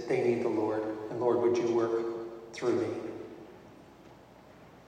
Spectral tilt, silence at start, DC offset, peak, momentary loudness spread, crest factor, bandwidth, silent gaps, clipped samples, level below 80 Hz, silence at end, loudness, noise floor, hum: -6.5 dB/octave; 0 s; under 0.1%; -16 dBFS; 16 LU; 16 dB; 9.4 kHz; none; under 0.1%; -70 dBFS; 0.1 s; -31 LUFS; -54 dBFS; none